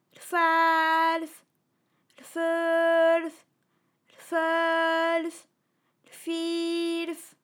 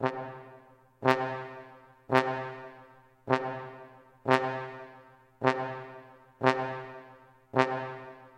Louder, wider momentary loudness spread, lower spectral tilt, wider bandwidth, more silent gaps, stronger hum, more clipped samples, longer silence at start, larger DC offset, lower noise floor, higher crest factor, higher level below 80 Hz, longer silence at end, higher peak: first, -25 LUFS vs -31 LUFS; second, 14 LU vs 21 LU; second, -1.5 dB/octave vs -6 dB/octave; first, 18 kHz vs 16 kHz; neither; neither; neither; first, 0.2 s vs 0 s; neither; first, -74 dBFS vs -56 dBFS; second, 14 dB vs 28 dB; second, under -90 dBFS vs -74 dBFS; about the same, 0.15 s vs 0.1 s; second, -12 dBFS vs -4 dBFS